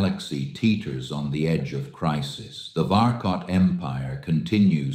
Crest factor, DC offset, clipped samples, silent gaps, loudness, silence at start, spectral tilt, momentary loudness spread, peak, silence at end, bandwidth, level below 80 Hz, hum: 16 dB; under 0.1%; under 0.1%; none; -24 LUFS; 0 s; -7 dB/octave; 10 LU; -6 dBFS; 0 s; 10 kHz; -50 dBFS; none